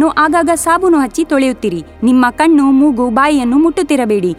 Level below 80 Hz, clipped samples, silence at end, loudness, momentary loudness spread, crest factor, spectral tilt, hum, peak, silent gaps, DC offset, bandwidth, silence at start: -40 dBFS; under 0.1%; 0.05 s; -11 LUFS; 4 LU; 12 dB; -4.5 dB/octave; none; 0 dBFS; none; under 0.1%; 15 kHz; 0 s